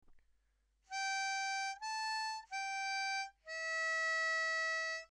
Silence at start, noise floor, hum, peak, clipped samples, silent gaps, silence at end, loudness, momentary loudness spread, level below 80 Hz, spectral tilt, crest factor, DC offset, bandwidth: 0.1 s; -78 dBFS; none; -30 dBFS; under 0.1%; none; 0.05 s; -37 LUFS; 7 LU; -76 dBFS; 3.5 dB/octave; 10 dB; under 0.1%; 13 kHz